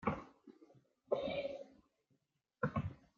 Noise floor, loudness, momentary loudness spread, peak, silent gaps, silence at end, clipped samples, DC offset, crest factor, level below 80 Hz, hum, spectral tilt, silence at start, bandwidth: -82 dBFS; -42 LUFS; 21 LU; -22 dBFS; none; 0.2 s; under 0.1%; under 0.1%; 22 dB; -66 dBFS; none; -5.5 dB/octave; 0 s; 7.2 kHz